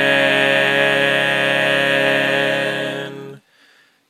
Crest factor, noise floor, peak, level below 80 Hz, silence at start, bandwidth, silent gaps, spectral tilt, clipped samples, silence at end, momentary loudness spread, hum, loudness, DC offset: 16 dB; -54 dBFS; -2 dBFS; -70 dBFS; 0 s; 15 kHz; none; -4 dB/octave; under 0.1%; 0.7 s; 11 LU; none; -15 LUFS; under 0.1%